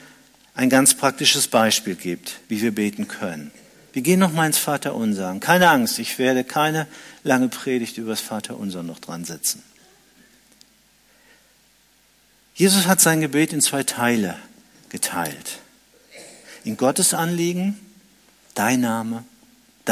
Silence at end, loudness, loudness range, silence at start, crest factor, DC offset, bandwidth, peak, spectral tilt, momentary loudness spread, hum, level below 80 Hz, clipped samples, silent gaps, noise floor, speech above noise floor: 0 s; -20 LUFS; 10 LU; 0.55 s; 22 dB; under 0.1%; 16 kHz; 0 dBFS; -3 dB/octave; 18 LU; none; -66 dBFS; under 0.1%; none; -58 dBFS; 37 dB